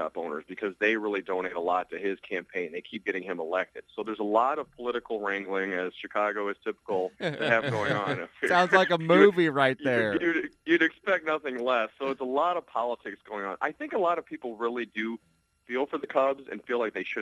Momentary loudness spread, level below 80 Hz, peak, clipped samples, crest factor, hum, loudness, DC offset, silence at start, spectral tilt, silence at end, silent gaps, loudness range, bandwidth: 12 LU; -72 dBFS; -6 dBFS; under 0.1%; 22 dB; none; -28 LUFS; under 0.1%; 0 s; -6 dB/octave; 0 s; none; 8 LU; 11.5 kHz